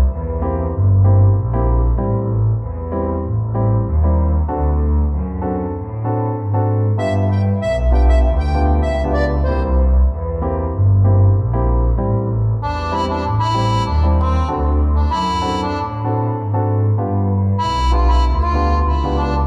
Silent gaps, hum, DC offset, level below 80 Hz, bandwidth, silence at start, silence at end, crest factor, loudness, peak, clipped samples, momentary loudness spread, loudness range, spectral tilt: none; none; under 0.1%; -20 dBFS; 8 kHz; 0 s; 0 s; 12 dB; -17 LUFS; -4 dBFS; under 0.1%; 6 LU; 2 LU; -8.5 dB/octave